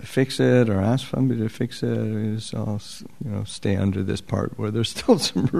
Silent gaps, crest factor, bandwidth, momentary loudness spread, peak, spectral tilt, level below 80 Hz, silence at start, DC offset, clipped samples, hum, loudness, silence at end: none; 18 dB; 13.5 kHz; 11 LU; -4 dBFS; -6 dB/octave; -52 dBFS; 0 s; 0.7%; under 0.1%; none; -23 LUFS; 0 s